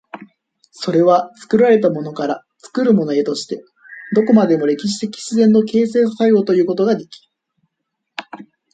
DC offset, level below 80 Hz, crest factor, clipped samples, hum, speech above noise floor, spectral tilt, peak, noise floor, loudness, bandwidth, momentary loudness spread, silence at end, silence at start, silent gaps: under 0.1%; -64 dBFS; 14 dB; under 0.1%; none; 61 dB; -6.5 dB/octave; -2 dBFS; -76 dBFS; -16 LUFS; 9.2 kHz; 17 LU; 0.3 s; 0.15 s; none